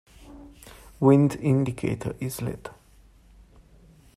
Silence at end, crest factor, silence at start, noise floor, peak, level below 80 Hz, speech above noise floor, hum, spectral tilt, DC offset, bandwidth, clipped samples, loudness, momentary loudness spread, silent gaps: 1.45 s; 20 dB; 0.3 s; -55 dBFS; -6 dBFS; -52 dBFS; 32 dB; none; -8 dB/octave; under 0.1%; 14.5 kHz; under 0.1%; -24 LUFS; 25 LU; none